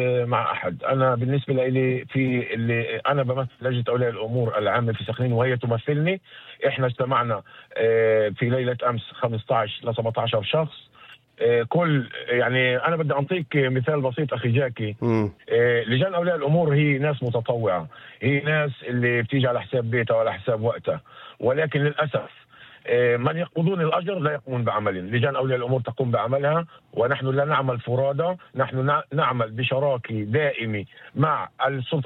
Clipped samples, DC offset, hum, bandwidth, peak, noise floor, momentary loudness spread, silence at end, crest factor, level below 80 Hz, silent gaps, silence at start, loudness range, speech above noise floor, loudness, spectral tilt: under 0.1%; under 0.1%; none; 4.1 kHz; -8 dBFS; -50 dBFS; 6 LU; 0 s; 14 dB; -64 dBFS; none; 0 s; 2 LU; 27 dB; -23 LUFS; -9.5 dB/octave